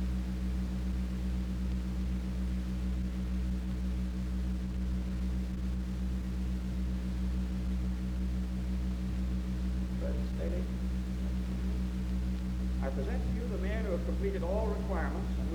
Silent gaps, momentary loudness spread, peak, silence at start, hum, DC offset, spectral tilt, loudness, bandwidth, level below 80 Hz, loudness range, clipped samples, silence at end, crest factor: none; 2 LU; -22 dBFS; 0 s; none; under 0.1%; -8 dB/octave; -35 LUFS; 10 kHz; -34 dBFS; 1 LU; under 0.1%; 0 s; 12 dB